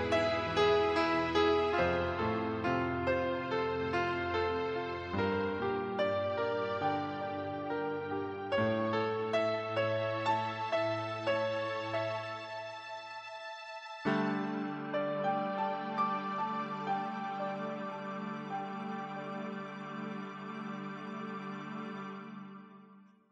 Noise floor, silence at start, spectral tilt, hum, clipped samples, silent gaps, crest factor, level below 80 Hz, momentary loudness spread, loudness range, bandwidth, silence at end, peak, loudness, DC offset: -59 dBFS; 0 s; -6.5 dB/octave; none; under 0.1%; none; 18 dB; -62 dBFS; 12 LU; 9 LU; 9.2 kHz; 0.3 s; -16 dBFS; -35 LUFS; under 0.1%